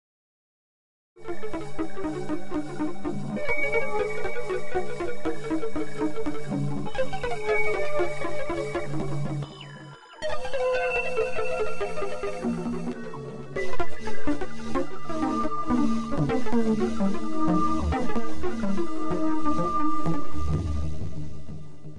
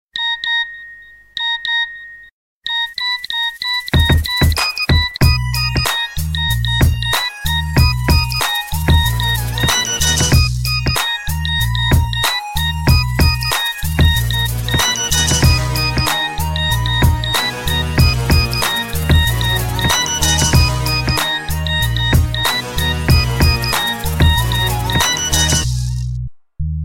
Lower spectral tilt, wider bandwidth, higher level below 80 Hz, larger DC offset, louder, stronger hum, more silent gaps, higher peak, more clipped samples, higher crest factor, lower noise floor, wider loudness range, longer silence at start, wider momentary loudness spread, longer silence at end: first, -6.5 dB/octave vs -3.5 dB/octave; second, 11.5 kHz vs 17 kHz; second, -42 dBFS vs -22 dBFS; neither; second, -29 LUFS vs -15 LUFS; neither; second, none vs 2.32-2.61 s; second, -12 dBFS vs 0 dBFS; neither; second, 10 dB vs 16 dB; first, -44 dBFS vs -39 dBFS; first, 5 LU vs 2 LU; first, 1.2 s vs 0.15 s; first, 10 LU vs 6 LU; about the same, 0 s vs 0 s